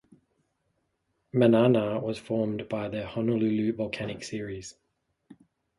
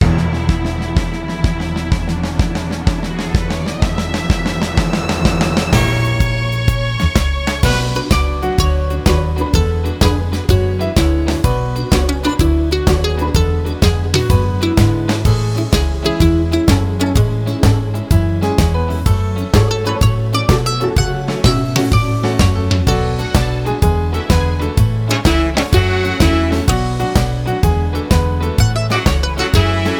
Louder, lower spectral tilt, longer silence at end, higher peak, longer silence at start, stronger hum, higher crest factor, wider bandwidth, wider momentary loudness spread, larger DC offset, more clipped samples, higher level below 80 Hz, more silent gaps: second, -27 LUFS vs -16 LUFS; about the same, -7 dB/octave vs -6 dB/octave; first, 0.45 s vs 0 s; second, -8 dBFS vs 0 dBFS; first, 1.35 s vs 0 s; neither; first, 20 dB vs 14 dB; second, 11.5 kHz vs over 20 kHz; first, 14 LU vs 4 LU; neither; neither; second, -62 dBFS vs -20 dBFS; neither